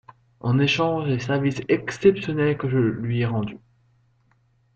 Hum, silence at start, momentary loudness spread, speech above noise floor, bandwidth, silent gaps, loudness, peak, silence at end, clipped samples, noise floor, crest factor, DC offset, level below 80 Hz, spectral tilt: none; 0.45 s; 6 LU; 41 dB; 8 kHz; none; -23 LUFS; -4 dBFS; 1.2 s; under 0.1%; -63 dBFS; 20 dB; under 0.1%; -54 dBFS; -7 dB/octave